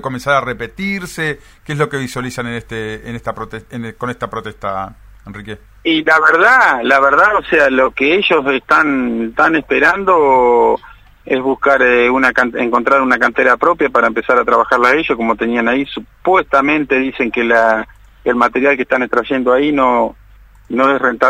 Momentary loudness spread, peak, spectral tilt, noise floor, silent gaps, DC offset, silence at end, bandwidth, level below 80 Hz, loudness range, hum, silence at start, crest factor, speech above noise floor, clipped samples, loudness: 14 LU; 0 dBFS; -5 dB/octave; -43 dBFS; none; under 0.1%; 0 s; 16 kHz; -44 dBFS; 11 LU; none; 0.05 s; 14 dB; 29 dB; under 0.1%; -13 LUFS